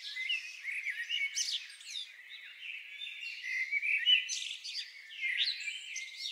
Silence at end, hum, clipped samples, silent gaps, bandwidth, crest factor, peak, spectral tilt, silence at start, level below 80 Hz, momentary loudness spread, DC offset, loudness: 0 s; none; under 0.1%; none; 16 kHz; 22 dB; -16 dBFS; 9 dB/octave; 0 s; under -90 dBFS; 15 LU; under 0.1%; -34 LUFS